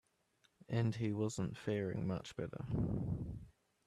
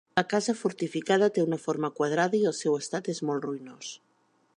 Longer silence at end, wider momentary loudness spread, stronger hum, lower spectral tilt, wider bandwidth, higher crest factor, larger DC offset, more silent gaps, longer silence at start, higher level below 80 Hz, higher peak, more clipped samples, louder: second, 0.35 s vs 0.6 s; second, 8 LU vs 13 LU; neither; first, -7 dB/octave vs -5 dB/octave; about the same, 11.5 kHz vs 11 kHz; about the same, 16 dB vs 20 dB; neither; neither; first, 0.7 s vs 0.15 s; first, -58 dBFS vs -76 dBFS; second, -24 dBFS vs -8 dBFS; neither; second, -40 LUFS vs -28 LUFS